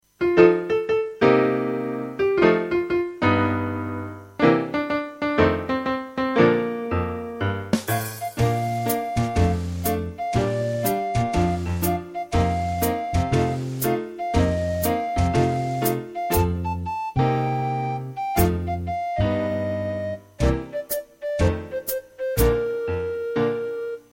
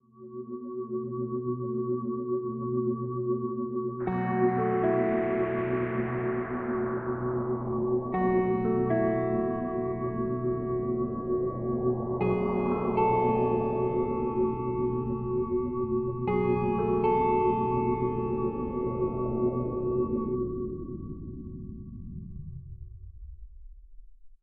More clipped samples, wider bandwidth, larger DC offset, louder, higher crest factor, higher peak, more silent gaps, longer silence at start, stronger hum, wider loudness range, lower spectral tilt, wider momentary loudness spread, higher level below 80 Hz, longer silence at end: neither; first, 17 kHz vs 3.5 kHz; neither; first, -23 LUFS vs -29 LUFS; about the same, 20 dB vs 16 dB; first, -2 dBFS vs -14 dBFS; neither; about the same, 0.2 s vs 0.15 s; neither; about the same, 3 LU vs 5 LU; second, -6.5 dB/octave vs -12 dB/octave; second, 9 LU vs 15 LU; first, -36 dBFS vs -48 dBFS; about the same, 0.15 s vs 0.1 s